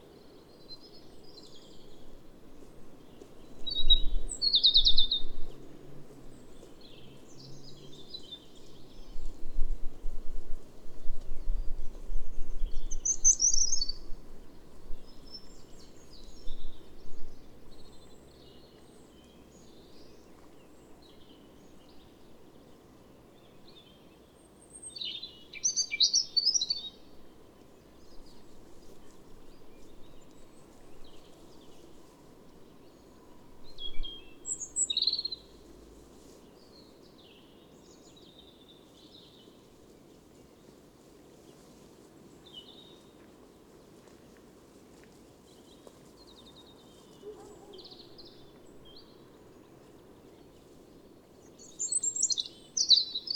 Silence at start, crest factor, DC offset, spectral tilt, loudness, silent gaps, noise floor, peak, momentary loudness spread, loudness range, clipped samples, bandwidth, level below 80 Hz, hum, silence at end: 0.7 s; 22 dB; under 0.1%; 0 dB/octave; -28 LUFS; none; -57 dBFS; -8 dBFS; 30 LU; 27 LU; under 0.1%; 9 kHz; -40 dBFS; none; 0 s